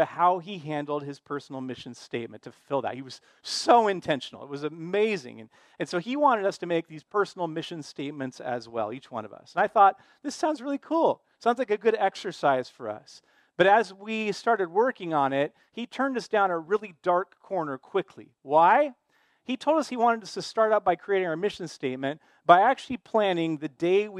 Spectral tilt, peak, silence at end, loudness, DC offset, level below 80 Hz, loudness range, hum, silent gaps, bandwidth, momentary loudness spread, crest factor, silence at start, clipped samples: -5 dB/octave; -2 dBFS; 0 s; -26 LUFS; under 0.1%; -74 dBFS; 4 LU; none; none; 11.5 kHz; 16 LU; 24 dB; 0 s; under 0.1%